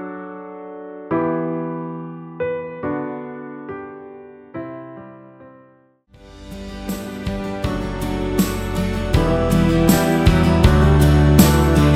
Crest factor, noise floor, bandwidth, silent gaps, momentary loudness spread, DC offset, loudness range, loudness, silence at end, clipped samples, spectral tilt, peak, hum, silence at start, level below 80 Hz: 18 dB; -53 dBFS; 16.5 kHz; none; 21 LU; under 0.1%; 19 LU; -18 LUFS; 0 s; under 0.1%; -6.5 dB/octave; 0 dBFS; none; 0 s; -26 dBFS